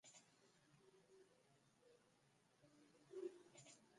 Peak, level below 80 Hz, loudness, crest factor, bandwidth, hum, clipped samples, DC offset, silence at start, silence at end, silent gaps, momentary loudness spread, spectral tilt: -40 dBFS; under -90 dBFS; -59 LUFS; 24 dB; 11 kHz; none; under 0.1%; under 0.1%; 0.05 s; 0 s; none; 12 LU; -4 dB/octave